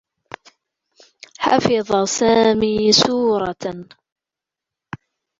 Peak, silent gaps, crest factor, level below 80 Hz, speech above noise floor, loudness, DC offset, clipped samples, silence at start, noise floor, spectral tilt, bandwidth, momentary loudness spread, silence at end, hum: -2 dBFS; none; 18 dB; -52 dBFS; 70 dB; -17 LUFS; under 0.1%; under 0.1%; 1.4 s; -87 dBFS; -3.5 dB/octave; 7.8 kHz; 24 LU; 1.55 s; none